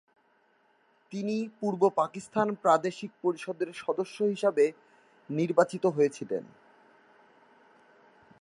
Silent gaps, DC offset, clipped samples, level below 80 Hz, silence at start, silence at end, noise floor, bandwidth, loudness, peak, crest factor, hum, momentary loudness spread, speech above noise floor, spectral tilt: none; under 0.1%; under 0.1%; -82 dBFS; 1.1 s; 2 s; -68 dBFS; 11.5 kHz; -29 LUFS; -8 dBFS; 22 dB; none; 10 LU; 39 dB; -6 dB/octave